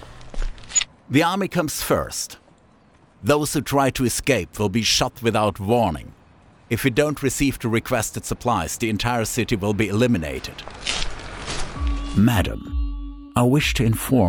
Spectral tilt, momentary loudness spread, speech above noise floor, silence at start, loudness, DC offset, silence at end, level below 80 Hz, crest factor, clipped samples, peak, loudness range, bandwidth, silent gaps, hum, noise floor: -4.5 dB/octave; 11 LU; 33 dB; 0 s; -22 LUFS; under 0.1%; 0 s; -34 dBFS; 18 dB; under 0.1%; -4 dBFS; 3 LU; over 20 kHz; none; none; -54 dBFS